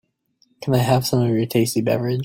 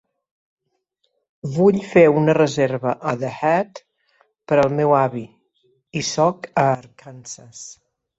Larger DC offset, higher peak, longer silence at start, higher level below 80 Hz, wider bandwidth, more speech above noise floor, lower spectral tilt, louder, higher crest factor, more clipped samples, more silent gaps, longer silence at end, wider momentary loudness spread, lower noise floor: neither; about the same, -4 dBFS vs -2 dBFS; second, 0.6 s vs 1.45 s; about the same, -54 dBFS vs -58 dBFS; first, 16.5 kHz vs 8.2 kHz; second, 45 dB vs 53 dB; about the same, -6 dB/octave vs -6 dB/octave; about the same, -20 LUFS vs -19 LUFS; about the same, 16 dB vs 18 dB; neither; neither; second, 0 s vs 0.45 s; second, 4 LU vs 21 LU; second, -63 dBFS vs -72 dBFS